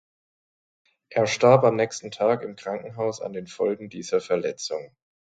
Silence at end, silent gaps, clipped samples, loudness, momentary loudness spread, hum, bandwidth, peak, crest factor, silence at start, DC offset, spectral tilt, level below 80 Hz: 0.4 s; none; under 0.1%; -24 LUFS; 15 LU; none; 9.2 kHz; -4 dBFS; 22 dB; 1.1 s; under 0.1%; -5 dB/octave; -68 dBFS